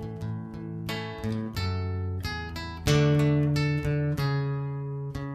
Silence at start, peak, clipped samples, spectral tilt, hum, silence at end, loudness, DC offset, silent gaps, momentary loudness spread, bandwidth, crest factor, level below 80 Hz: 0 s; -10 dBFS; under 0.1%; -6.5 dB/octave; none; 0 s; -29 LUFS; under 0.1%; none; 12 LU; 14.5 kHz; 18 dB; -44 dBFS